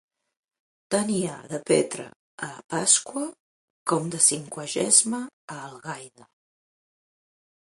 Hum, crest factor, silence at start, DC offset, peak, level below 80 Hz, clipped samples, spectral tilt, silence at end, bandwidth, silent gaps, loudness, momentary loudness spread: none; 24 dB; 0.9 s; under 0.1%; -4 dBFS; -72 dBFS; under 0.1%; -2.5 dB/octave; 1.65 s; 12 kHz; 2.16-2.38 s, 2.64-2.69 s, 3.40-3.86 s, 5.33-5.48 s; -23 LUFS; 19 LU